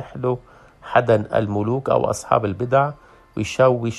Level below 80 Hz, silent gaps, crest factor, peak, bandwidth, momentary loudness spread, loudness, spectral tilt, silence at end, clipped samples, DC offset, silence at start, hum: -52 dBFS; none; 20 dB; -2 dBFS; 12.5 kHz; 9 LU; -20 LUFS; -6.5 dB/octave; 0 s; under 0.1%; under 0.1%; 0 s; none